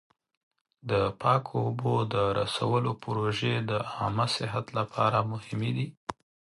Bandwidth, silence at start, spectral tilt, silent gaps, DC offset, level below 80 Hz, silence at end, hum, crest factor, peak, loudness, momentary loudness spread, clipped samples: 11.5 kHz; 0.85 s; -6 dB/octave; 5.97-6.07 s; under 0.1%; -58 dBFS; 0.45 s; none; 18 dB; -10 dBFS; -29 LUFS; 7 LU; under 0.1%